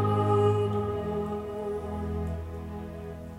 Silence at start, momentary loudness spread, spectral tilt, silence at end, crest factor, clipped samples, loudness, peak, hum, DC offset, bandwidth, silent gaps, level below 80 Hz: 0 s; 15 LU; -8.5 dB/octave; 0 s; 16 dB; under 0.1%; -30 LUFS; -12 dBFS; none; under 0.1%; 11.5 kHz; none; -48 dBFS